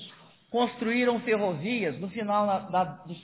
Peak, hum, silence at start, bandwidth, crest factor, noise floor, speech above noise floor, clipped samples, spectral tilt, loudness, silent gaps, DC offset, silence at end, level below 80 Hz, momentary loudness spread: -12 dBFS; none; 0 s; 4 kHz; 16 dB; -51 dBFS; 23 dB; under 0.1%; -9.5 dB/octave; -28 LUFS; none; under 0.1%; 0.05 s; -68 dBFS; 8 LU